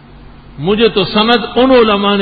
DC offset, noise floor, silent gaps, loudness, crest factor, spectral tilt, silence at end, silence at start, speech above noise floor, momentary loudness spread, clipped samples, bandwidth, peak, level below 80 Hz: under 0.1%; -36 dBFS; none; -11 LUFS; 12 dB; -8 dB/octave; 0 s; 0.5 s; 25 dB; 6 LU; under 0.1%; 4.9 kHz; 0 dBFS; -38 dBFS